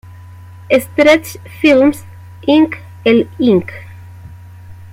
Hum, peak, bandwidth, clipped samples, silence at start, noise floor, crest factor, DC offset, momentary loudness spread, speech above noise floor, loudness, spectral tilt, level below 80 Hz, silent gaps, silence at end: none; 0 dBFS; 16.5 kHz; under 0.1%; 0.7 s; -35 dBFS; 14 dB; under 0.1%; 18 LU; 23 dB; -13 LUFS; -5.5 dB/octave; -50 dBFS; none; 0.05 s